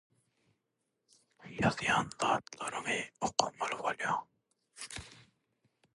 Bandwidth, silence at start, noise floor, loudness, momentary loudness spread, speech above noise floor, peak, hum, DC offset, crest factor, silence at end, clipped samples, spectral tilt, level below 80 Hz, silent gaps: 11.5 kHz; 1.4 s; -84 dBFS; -34 LUFS; 14 LU; 50 dB; -10 dBFS; none; under 0.1%; 28 dB; 0.75 s; under 0.1%; -3.5 dB/octave; -66 dBFS; none